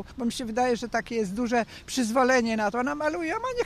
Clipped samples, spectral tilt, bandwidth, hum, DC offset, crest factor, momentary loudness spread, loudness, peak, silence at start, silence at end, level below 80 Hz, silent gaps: under 0.1%; -4 dB/octave; 15 kHz; none; under 0.1%; 16 dB; 8 LU; -26 LUFS; -10 dBFS; 0 s; 0 s; -52 dBFS; none